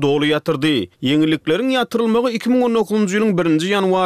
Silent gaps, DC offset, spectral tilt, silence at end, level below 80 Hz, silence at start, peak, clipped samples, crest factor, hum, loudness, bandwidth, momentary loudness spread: none; under 0.1%; -5.5 dB/octave; 0 s; -56 dBFS; 0 s; -6 dBFS; under 0.1%; 10 dB; none; -17 LUFS; 14.5 kHz; 2 LU